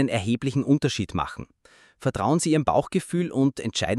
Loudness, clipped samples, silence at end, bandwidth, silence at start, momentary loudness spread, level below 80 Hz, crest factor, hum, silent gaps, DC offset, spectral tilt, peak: -24 LUFS; under 0.1%; 0 s; 12.5 kHz; 0 s; 8 LU; -50 dBFS; 18 dB; none; none; under 0.1%; -5.5 dB/octave; -6 dBFS